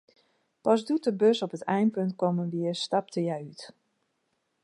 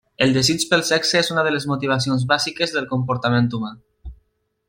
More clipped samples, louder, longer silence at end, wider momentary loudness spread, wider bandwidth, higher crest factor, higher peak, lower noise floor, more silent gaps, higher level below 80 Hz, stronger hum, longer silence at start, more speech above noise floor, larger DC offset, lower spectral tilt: neither; second, -28 LUFS vs -19 LUFS; first, 0.95 s vs 0.55 s; first, 11 LU vs 6 LU; second, 11.5 kHz vs 16.5 kHz; about the same, 20 dB vs 18 dB; second, -10 dBFS vs -2 dBFS; first, -77 dBFS vs -65 dBFS; neither; second, -80 dBFS vs -50 dBFS; neither; first, 0.65 s vs 0.2 s; about the same, 49 dB vs 46 dB; neither; first, -6.5 dB/octave vs -4 dB/octave